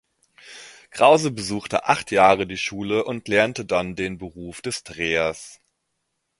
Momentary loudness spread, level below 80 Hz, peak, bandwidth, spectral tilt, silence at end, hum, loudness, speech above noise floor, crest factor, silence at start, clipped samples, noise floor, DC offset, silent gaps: 21 LU; -54 dBFS; 0 dBFS; 11.5 kHz; -4 dB/octave; 0.85 s; none; -21 LUFS; 54 dB; 22 dB; 0.45 s; under 0.1%; -76 dBFS; under 0.1%; none